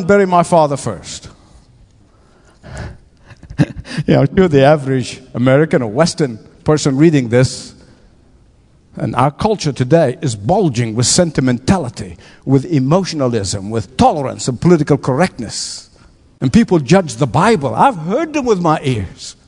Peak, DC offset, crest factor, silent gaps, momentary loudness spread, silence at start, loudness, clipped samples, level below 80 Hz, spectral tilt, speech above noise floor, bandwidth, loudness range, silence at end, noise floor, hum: 0 dBFS; under 0.1%; 14 dB; none; 14 LU; 0 s; -14 LUFS; under 0.1%; -40 dBFS; -6 dB/octave; 35 dB; 11 kHz; 4 LU; 0.15 s; -49 dBFS; none